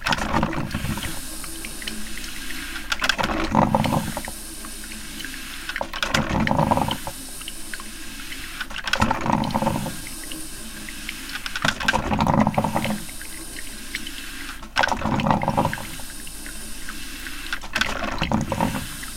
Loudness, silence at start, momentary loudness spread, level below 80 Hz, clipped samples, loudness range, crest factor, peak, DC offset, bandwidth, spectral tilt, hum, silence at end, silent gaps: -25 LUFS; 0 s; 13 LU; -36 dBFS; under 0.1%; 2 LU; 22 dB; -4 dBFS; under 0.1%; 17 kHz; -4 dB/octave; none; 0 s; none